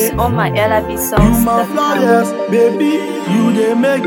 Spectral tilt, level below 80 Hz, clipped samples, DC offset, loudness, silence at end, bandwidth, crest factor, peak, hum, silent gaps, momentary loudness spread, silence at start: -5.5 dB/octave; -28 dBFS; under 0.1%; under 0.1%; -13 LUFS; 0 s; 19 kHz; 12 dB; 0 dBFS; none; none; 4 LU; 0 s